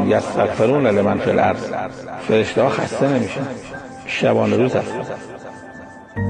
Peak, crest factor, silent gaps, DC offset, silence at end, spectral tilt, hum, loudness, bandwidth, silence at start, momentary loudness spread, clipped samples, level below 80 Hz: -2 dBFS; 16 dB; none; under 0.1%; 0 s; -6.5 dB/octave; none; -18 LUFS; 9.8 kHz; 0 s; 17 LU; under 0.1%; -50 dBFS